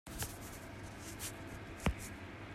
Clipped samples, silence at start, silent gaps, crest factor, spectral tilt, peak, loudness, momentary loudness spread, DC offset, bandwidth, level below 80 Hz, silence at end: under 0.1%; 0.05 s; none; 28 dB; -4 dB/octave; -16 dBFS; -44 LUFS; 9 LU; under 0.1%; 16 kHz; -52 dBFS; 0 s